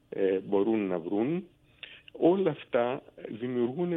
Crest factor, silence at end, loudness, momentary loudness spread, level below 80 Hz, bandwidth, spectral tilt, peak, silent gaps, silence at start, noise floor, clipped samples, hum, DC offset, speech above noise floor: 18 dB; 0 s; -29 LUFS; 18 LU; -70 dBFS; 3.9 kHz; -10 dB/octave; -12 dBFS; none; 0.1 s; -50 dBFS; under 0.1%; none; under 0.1%; 22 dB